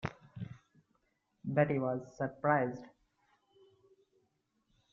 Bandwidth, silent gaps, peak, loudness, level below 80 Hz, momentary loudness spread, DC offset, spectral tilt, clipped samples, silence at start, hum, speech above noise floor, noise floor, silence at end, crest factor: 7.2 kHz; none; -14 dBFS; -34 LUFS; -70 dBFS; 17 LU; under 0.1%; -7 dB/octave; under 0.1%; 0.05 s; none; 46 dB; -79 dBFS; 2.05 s; 24 dB